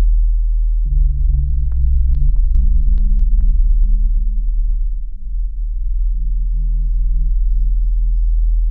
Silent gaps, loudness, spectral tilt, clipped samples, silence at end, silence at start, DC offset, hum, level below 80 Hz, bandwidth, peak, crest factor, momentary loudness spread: none; -20 LUFS; -12 dB/octave; under 0.1%; 0 s; 0 s; under 0.1%; none; -14 dBFS; 0.3 kHz; -4 dBFS; 10 dB; 6 LU